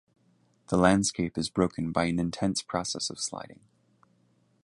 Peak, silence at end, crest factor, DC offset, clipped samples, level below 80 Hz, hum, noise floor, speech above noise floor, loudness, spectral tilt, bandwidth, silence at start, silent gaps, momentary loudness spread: -6 dBFS; 1.1 s; 24 dB; under 0.1%; under 0.1%; -54 dBFS; none; -67 dBFS; 39 dB; -28 LUFS; -4.5 dB/octave; 11.5 kHz; 0.7 s; none; 11 LU